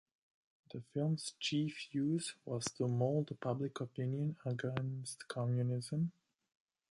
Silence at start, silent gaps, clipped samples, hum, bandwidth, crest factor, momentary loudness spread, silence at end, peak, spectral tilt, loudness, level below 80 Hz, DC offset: 0.75 s; none; under 0.1%; none; 11.5 kHz; 18 dB; 6 LU; 0.8 s; -20 dBFS; -6 dB/octave; -39 LUFS; -76 dBFS; under 0.1%